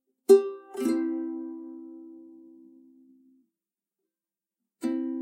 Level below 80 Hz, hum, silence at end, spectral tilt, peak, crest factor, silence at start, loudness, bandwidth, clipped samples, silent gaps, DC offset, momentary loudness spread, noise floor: under -90 dBFS; none; 0 s; -5 dB/octave; -6 dBFS; 24 dB; 0.3 s; -26 LUFS; 15.5 kHz; under 0.1%; none; under 0.1%; 25 LU; under -90 dBFS